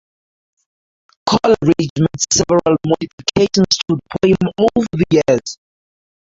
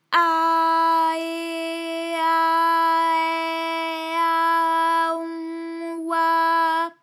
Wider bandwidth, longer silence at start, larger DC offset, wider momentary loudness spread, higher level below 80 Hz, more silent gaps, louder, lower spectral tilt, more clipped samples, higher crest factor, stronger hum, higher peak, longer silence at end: second, 7.8 kHz vs 15.5 kHz; first, 1.25 s vs 0.1 s; neither; second, 6 LU vs 9 LU; first, -44 dBFS vs under -90 dBFS; first, 1.90-1.96 s, 3.13-3.18 s vs none; first, -15 LUFS vs -21 LUFS; first, -4.5 dB/octave vs -1 dB/octave; neither; about the same, 16 dB vs 16 dB; neither; first, -2 dBFS vs -6 dBFS; first, 0.75 s vs 0.1 s